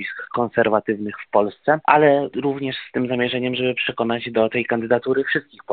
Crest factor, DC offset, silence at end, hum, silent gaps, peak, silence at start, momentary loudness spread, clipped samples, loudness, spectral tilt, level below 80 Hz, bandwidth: 20 dB; under 0.1%; 0 s; none; none; 0 dBFS; 0 s; 9 LU; under 0.1%; -20 LUFS; -3.5 dB/octave; -60 dBFS; 4.6 kHz